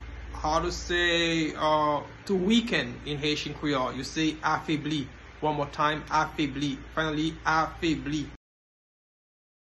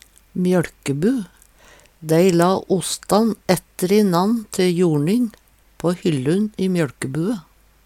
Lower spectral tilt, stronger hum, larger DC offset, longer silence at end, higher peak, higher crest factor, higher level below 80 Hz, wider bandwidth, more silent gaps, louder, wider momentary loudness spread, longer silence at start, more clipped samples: second, -4.5 dB/octave vs -6 dB/octave; neither; neither; first, 1.35 s vs 0.45 s; second, -10 dBFS vs -2 dBFS; about the same, 18 dB vs 18 dB; first, -46 dBFS vs -54 dBFS; second, 12 kHz vs 16.5 kHz; neither; second, -28 LUFS vs -19 LUFS; about the same, 8 LU vs 9 LU; second, 0 s vs 0.35 s; neither